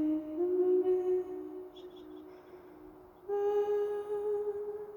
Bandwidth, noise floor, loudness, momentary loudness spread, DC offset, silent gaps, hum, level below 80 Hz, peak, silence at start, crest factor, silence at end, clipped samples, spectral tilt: 18.5 kHz; -54 dBFS; -33 LUFS; 24 LU; under 0.1%; none; none; -70 dBFS; -22 dBFS; 0 s; 12 dB; 0 s; under 0.1%; -7.5 dB/octave